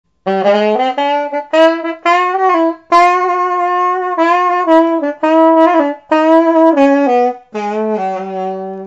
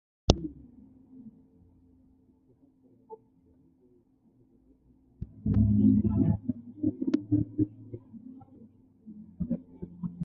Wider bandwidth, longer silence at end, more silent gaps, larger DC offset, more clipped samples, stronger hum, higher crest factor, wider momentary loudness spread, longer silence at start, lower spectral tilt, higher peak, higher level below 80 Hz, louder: first, 8 kHz vs 7.2 kHz; about the same, 0 s vs 0 s; neither; neither; first, 0.4% vs under 0.1%; neither; second, 12 dB vs 32 dB; second, 9 LU vs 28 LU; about the same, 0.25 s vs 0.3 s; second, -5.5 dB/octave vs -7.5 dB/octave; about the same, 0 dBFS vs 0 dBFS; second, -60 dBFS vs -44 dBFS; first, -12 LUFS vs -29 LUFS